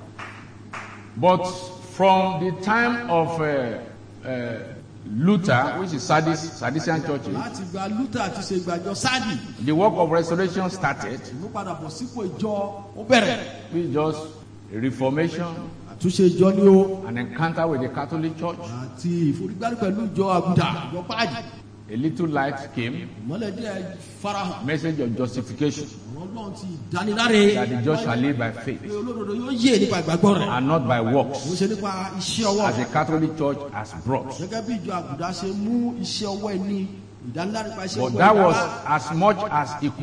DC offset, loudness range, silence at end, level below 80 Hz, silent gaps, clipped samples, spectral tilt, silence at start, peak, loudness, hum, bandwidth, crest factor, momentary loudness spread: under 0.1%; 6 LU; 0 s; -56 dBFS; none; under 0.1%; -5.5 dB/octave; 0 s; -4 dBFS; -23 LUFS; none; 10.5 kHz; 18 dB; 15 LU